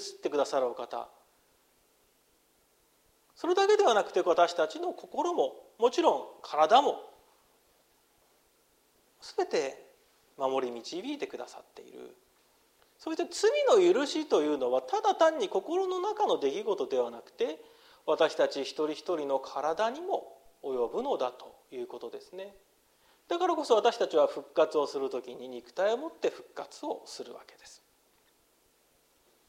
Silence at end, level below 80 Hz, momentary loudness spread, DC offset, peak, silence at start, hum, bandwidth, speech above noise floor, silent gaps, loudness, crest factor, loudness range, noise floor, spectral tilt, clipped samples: 1.75 s; -78 dBFS; 19 LU; under 0.1%; -10 dBFS; 0 s; none; 16 kHz; 39 dB; none; -30 LUFS; 22 dB; 10 LU; -69 dBFS; -3 dB/octave; under 0.1%